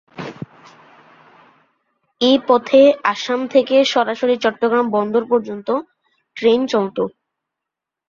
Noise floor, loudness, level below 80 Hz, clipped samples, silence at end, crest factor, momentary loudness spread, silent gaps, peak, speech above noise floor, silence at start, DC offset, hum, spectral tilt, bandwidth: -84 dBFS; -17 LUFS; -64 dBFS; under 0.1%; 1 s; 16 dB; 16 LU; none; -2 dBFS; 68 dB; 0.15 s; under 0.1%; none; -4.5 dB/octave; 7.4 kHz